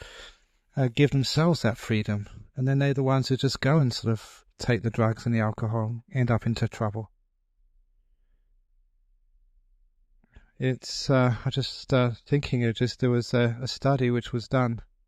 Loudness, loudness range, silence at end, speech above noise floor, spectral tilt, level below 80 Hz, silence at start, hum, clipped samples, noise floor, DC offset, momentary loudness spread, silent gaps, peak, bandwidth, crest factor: -26 LUFS; 8 LU; 0.25 s; 43 dB; -6.5 dB/octave; -52 dBFS; 0 s; none; under 0.1%; -68 dBFS; under 0.1%; 8 LU; none; -8 dBFS; 12 kHz; 18 dB